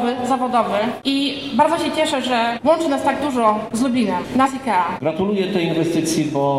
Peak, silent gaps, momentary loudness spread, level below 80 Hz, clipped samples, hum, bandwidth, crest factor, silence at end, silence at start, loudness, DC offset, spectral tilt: -4 dBFS; none; 3 LU; -54 dBFS; under 0.1%; none; 16 kHz; 14 dB; 0 s; 0 s; -19 LUFS; 0.1%; -5 dB/octave